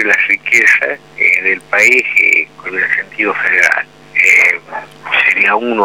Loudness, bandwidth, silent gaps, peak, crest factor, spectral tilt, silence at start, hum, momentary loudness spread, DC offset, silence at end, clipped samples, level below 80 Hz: -10 LUFS; 19.5 kHz; none; 0 dBFS; 12 dB; -2 dB/octave; 0 s; none; 10 LU; 0.3%; 0 s; under 0.1%; -60 dBFS